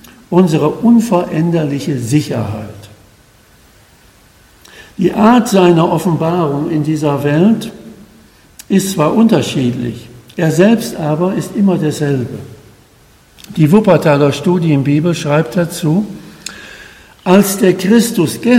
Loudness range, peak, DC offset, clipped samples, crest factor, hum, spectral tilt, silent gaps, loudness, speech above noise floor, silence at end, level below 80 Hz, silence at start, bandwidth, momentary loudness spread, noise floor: 4 LU; 0 dBFS; under 0.1%; 0.3%; 14 dB; none; -6.5 dB/octave; none; -12 LUFS; 34 dB; 0 s; -48 dBFS; 0.3 s; 16.5 kHz; 15 LU; -46 dBFS